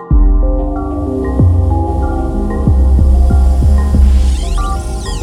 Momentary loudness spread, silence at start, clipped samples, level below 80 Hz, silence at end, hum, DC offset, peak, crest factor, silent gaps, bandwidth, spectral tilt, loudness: 7 LU; 0 s; under 0.1%; -12 dBFS; 0 s; none; under 0.1%; 0 dBFS; 10 dB; none; 10.5 kHz; -8 dB/octave; -13 LUFS